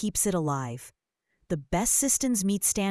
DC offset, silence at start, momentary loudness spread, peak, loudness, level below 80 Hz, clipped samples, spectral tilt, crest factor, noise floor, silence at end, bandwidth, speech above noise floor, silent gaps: under 0.1%; 0 s; 13 LU; -8 dBFS; -25 LUFS; -50 dBFS; under 0.1%; -4 dB/octave; 20 dB; -75 dBFS; 0 s; 12 kHz; 48 dB; none